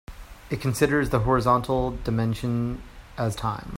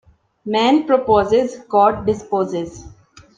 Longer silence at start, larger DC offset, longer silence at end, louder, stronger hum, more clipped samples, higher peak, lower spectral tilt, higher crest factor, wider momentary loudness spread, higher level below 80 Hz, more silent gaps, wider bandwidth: second, 0.1 s vs 0.45 s; neither; second, 0 s vs 0.5 s; second, -25 LUFS vs -17 LUFS; neither; neither; second, -6 dBFS vs -2 dBFS; about the same, -6.5 dB/octave vs -6 dB/octave; about the same, 18 dB vs 16 dB; about the same, 12 LU vs 10 LU; first, -40 dBFS vs -48 dBFS; neither; first, 16 kHz vs 9.2 kHz